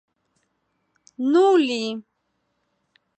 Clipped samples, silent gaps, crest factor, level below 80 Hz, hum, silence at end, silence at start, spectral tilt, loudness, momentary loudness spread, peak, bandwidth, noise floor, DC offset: under 0.1%; none; 16 dB; -84 dBFS; none; 1.2 s; 1.2 s; -4.5 dB/octave; -20 LUFS; 14 LU; -10 dBFS; 8.8 kHz; -73 dBFS; under 0.1%